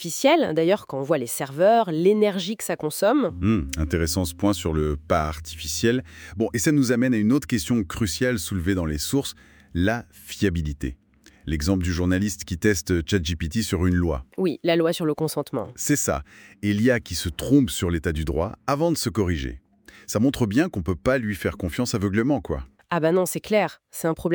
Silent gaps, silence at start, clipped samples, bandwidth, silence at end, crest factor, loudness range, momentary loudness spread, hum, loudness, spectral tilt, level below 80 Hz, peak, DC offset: none; 0 s; under 0.1%; over 20 kHz; 0 s; 18 dB; 3 LU; 8 LU; none; -23 LUFS; -5 dB/octave; -42 dBFS; -6 dBFS; under 0.1%